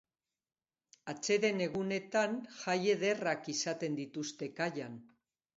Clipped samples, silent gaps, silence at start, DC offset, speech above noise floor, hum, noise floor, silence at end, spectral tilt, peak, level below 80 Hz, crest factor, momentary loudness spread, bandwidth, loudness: under 0.1%; none; 1.05 s; under 0.1%; over 55 dB; none; under -90 dBFS; 0.5 s; -3.5 dB/octave; -16 dBFS; -80 dBFS; 20 dB; 12 LU; 7.6 kHz; -35 LUFS